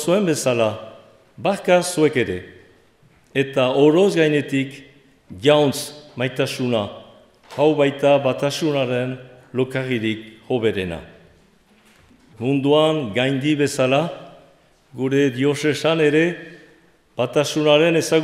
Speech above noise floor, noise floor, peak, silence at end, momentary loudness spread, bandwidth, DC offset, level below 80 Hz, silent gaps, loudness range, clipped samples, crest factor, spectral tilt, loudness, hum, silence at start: 36 dB; -55 dBFS; -2 dBFS; 0 s; 13 LU; 15.5 kHz; under 0.1%; -62 dBFS; none; 4 LU; under 0.1%; 18 dB; -5 dB/octave; -19 LUFS; none; 0 s